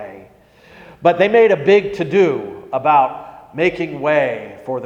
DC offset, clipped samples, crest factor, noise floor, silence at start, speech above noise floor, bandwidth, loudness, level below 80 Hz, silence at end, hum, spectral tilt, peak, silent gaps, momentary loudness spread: under 0.1%; under 0.1%; 16 dB; -47 dBFS; 0 s; 32 dB; 7.6 kHz; -16 LUFS; -56 dBFS; 0 s; none; -6.5 dB/octave; 0 dBFS; none; 14 LU